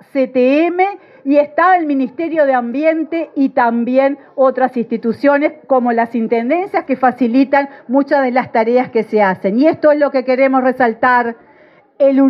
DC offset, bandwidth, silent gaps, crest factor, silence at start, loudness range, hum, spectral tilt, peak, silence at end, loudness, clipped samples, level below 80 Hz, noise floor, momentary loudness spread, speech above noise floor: under 0.1%; 5.8 kHz; none; 14 dB; 0.15 s; 2 LU; none; -8 dB/octave; 0 dBFS; 0 s; -14 LUFS; under 0.1%; -68 dBFS; -47 dBFS; 6 LU; 34 dB